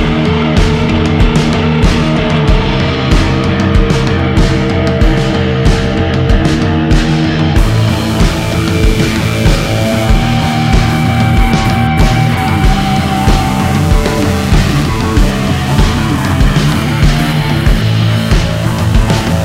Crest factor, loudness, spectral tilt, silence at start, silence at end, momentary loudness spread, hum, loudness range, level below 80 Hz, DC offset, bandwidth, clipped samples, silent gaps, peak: 10 dB; -11 LUFS; -6 dB/octave; 0 s; 0 s; 2 LU; none; 1 LU; -16 dBFS; under 0.1%; 16 kHz; 0.1%; none; 0 dBFS